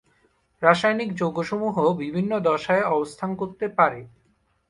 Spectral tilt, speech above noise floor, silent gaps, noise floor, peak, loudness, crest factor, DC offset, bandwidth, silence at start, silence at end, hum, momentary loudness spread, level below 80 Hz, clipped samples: -6.5 dB/octave; 43 dB; none; -66 dBFS; -4 dBFS; -23 LUFS; 20 dB; under 0.1%; 11.5 kHz; 0.6 s; 0.6 s; none; 9 LU; -62 dBFS; under 0.1%